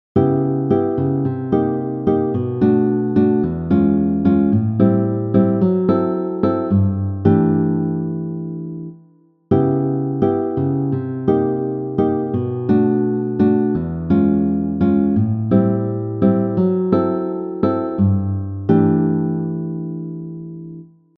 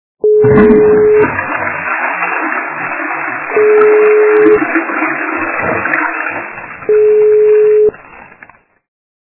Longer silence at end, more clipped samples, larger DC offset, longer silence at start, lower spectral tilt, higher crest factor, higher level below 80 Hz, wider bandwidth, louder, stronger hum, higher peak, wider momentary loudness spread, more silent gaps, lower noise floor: second, 0.35 s vs 1 s; second, under 0.1% vs 0.2%; neither; about the same, 0.15 s vs 0.25 s; first, -12.5 dB/octave vs -11 dB/octave; first, 18 dB vs 10 dB; second, -50 dBFS vs -42 dBFS; first, 4.2 kHz vs 3 kHz; second, -18 LUFS vs -10 LUFS; neither; about the same, 0 dBFS vs 0 dBFS; about the same, 8 LU vs 10 LU; neither; first, -52 dBFS vs -41 dBFS